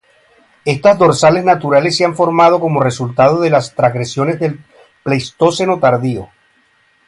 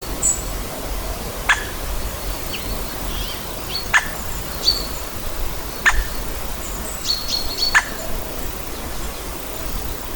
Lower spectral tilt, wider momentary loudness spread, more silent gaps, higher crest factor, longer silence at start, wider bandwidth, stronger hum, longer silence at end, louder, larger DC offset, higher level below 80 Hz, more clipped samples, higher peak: first, -5.5 dB/octave vs -1.5 dB/octave; about the same, 10 LU vs 9 LU; neither; second, 14 dB vs 20 dB; first, 0.65 s vs 0 s; second, 11.5 kHz vs over 20 kHz; neither; first, 0.85 s vs 0 s; first, -13 LUFS vs -22 LUFS; neither; second, -52 dBFS vs -30 dBFS; neither; about the same, 0 dBFS vs -2 dBFS